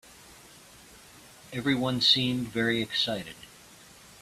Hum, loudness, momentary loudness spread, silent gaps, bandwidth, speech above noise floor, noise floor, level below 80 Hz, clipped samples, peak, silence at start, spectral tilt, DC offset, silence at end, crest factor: none; -26 LUFS; 21 LU; none; 14.5 kHz; 25 dB; -52 dBFS; -62 dBFS; under 0.1%; -10 dBFS; 0.25 s; -4 dB/octave; under 0.1%; 0.45 s; 22 dB